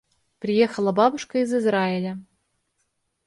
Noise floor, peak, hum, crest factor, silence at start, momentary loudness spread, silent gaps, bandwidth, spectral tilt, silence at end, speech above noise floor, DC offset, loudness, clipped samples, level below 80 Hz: -74 dBFS; -6 dBFS; none; 18 dB; 0.4 s; 12 LU; none; 11.5 kHz; -6 dB/octave; 1.05 s; 52 dB; under 0.1%; -22 LUFS; under 0.1%; -68 dBFS